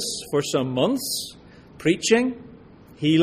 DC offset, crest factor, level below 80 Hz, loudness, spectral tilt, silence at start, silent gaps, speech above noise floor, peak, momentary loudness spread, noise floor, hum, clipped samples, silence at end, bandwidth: under 0.1%; 20 dB; -56 dBFS; -23 LUFS; -4.5 dB/octave; 0 s; none; 25 dB; -4 dBFS; 9 LU; -47 dBFS; none; under 0.1%; 0 s; 15.5 kHz